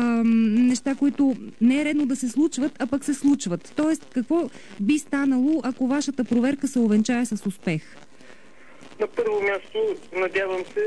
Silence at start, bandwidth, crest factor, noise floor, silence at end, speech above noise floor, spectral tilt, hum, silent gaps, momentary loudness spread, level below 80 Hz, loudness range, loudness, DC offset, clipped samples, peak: 0 s; 11 kHz; 12 dB; -50 dBFS; 0 s; 27 dB; -5.5 dB/octave; none; none; 7 LU; -64 dBFS; 5 LU; -23 LUFS; 0.6%; under 0.1%; -10 dBFS